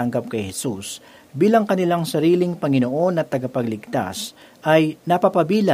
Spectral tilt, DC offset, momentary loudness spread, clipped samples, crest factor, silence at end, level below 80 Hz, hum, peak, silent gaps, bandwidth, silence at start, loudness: -6 dB/octave; under 0.1%; 12 LU; under 0.1%; 18 dB; 0 s; -62 dBFS; none; -2 dBFS; none; 16 kHz; 0 s; -20 LUFS